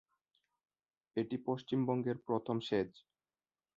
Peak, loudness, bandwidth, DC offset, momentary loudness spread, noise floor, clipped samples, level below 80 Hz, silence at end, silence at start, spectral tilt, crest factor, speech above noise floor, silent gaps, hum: -22 dBFS; -38 LUFS; 7.4 kHz; under 0.1%; 6 LU; under -90 dBFS; under 0.1%; -76 dBFS; 0.8 s; 1.15 s; -6 dB/octave; 18 dB; over 53 dB; none; none